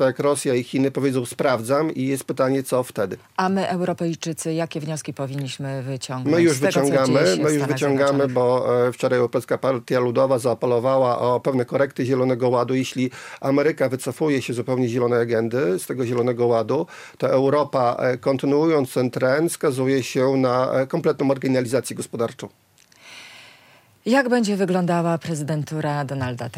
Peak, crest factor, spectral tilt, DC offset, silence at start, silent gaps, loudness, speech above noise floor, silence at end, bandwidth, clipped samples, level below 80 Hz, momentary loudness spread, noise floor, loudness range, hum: -4 dBFS; 16 dB; -6 dB/octave; under 0.1%; 0 s; none; -21 LUFS; 32 dB; 0 s; 16 kHz; under 0.1%; -68 dBFS; 9 LU; -53 dBFS; 5 LU; none